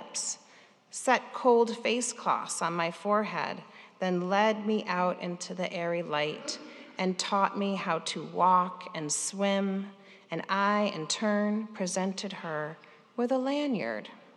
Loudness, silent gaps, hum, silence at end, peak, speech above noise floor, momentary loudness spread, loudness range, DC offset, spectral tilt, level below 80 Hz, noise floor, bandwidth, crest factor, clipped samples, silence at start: -30 LUFS; none; none; 0.15 s; -10 dBFS; 29 dB; 11 LU; 2 LU; under 0.1%; -4 dB/octave; -90 dBFS; -58 dBFS; 12.5 kHz; 22 dB; under 0.1%; 0 s